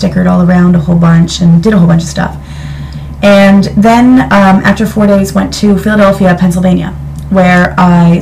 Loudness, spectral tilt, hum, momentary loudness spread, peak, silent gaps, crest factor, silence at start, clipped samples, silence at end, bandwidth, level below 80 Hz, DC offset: -7 LUFS; -7 dB/octave; none; 12 LU; 0 dBFS; none; 6 dB; 0 s; 4%; 0 s; 14.5 kHz; -26 dBFS; under 0.1%